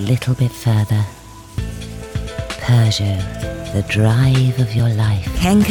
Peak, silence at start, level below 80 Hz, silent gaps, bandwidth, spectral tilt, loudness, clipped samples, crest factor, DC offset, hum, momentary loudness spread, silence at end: -4 dBFS; 0 s; -32 dBFS; none; 17 kHz; -6.5 dB/octave; -18 LUFS; under 0.1%; 14 dB; under 0.1%; none; 13 LU; 0 s